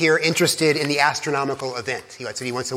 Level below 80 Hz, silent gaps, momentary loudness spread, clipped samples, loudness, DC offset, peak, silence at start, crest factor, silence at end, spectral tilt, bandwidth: -66 dBFS; none; 11 LU; under 0.1%; -21 LUFS; under 0.1%; -2 dBFS; 0 s; 18 dB; 0 s; -3.5 dB/octave; 16.5 kHz